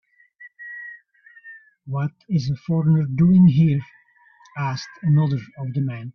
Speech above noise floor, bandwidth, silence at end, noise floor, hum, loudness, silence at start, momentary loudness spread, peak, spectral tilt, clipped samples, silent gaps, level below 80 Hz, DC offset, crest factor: 35 dB; 6.4 kHz; 0.05 s; -54 dBFS; none; -20 LUFS; 0.4 s; 22 LU; -6 dBFS; -8.5 dB/octave; under 0.1%; none; -56 dBFS; under 0.1%; 16 dB